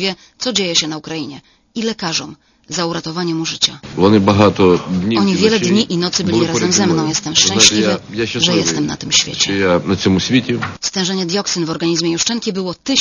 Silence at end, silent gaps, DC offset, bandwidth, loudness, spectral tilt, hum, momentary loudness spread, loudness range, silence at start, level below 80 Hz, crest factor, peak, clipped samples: 0 s; none; under 0.1%; 11 kHz; -15 LUFS; -3.5 dB/octave; none; 10 LU; 6 LU; 0 s; -48 dBFS; 16 dB; 0 dBFS; under 0.1%